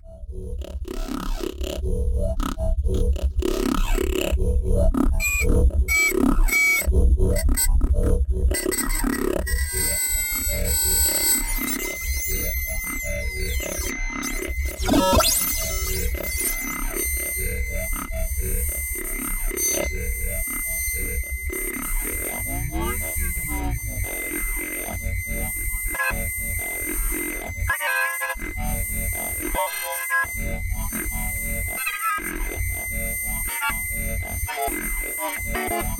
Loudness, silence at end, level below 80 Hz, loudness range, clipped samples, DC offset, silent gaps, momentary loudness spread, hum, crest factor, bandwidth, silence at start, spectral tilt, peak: -24 LUFS; 0 s; -26 dBFS; 6 LU; under 0.1%; under 0.1%; none; 9 LU; none; 16 dB; 17 kHz; 0.05 s; -3.5 dB/octave; -6 dBFS